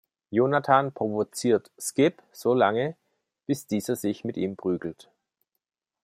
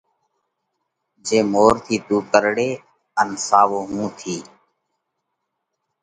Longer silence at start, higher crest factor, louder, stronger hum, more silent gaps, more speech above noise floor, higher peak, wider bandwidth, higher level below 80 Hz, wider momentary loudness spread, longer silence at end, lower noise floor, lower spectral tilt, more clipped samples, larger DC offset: second, 0.3 s vs 1.25 s; about the same, 22 dB vs 22 dB; second, -26 LUFS vs -19 LUFS; neither; neither; second, 53 dB vs 59 dB; second, -4 dBFS vs 0 dBFS; first, 16 kHz vs 11 kHz; second, -70 dBFS vs -54 dBFS; second, 9 LU vs 14 LU; second, 1.1 s vs 1.6 s; about the same, -78 dBFS vs -77 dBFS; first, -5.5 dB/octave vs -4 dB/octave; neither; neither